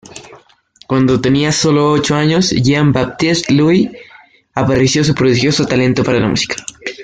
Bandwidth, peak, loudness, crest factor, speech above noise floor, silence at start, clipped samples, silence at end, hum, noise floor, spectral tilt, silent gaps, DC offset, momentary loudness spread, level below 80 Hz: 9.4 kHz; 0 dBFS; -13 LUFS; 12 dB; 35 dB; 0.15 s; under 0.1%; 0 s; none; -47 dBFS; -5 dB/octave; none; under 0.1%; 7 LU; -42 dBFS